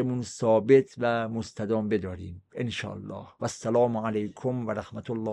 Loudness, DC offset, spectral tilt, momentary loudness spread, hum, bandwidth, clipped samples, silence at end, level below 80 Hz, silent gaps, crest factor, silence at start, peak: -28 LUFS; under 0.1%; -6.5 dB/octave; 15 LU; none; 10.5 kHz; under 0.1%; 0 s; -64 dBFS; none; 20 dB; 0 s; -8 dBFS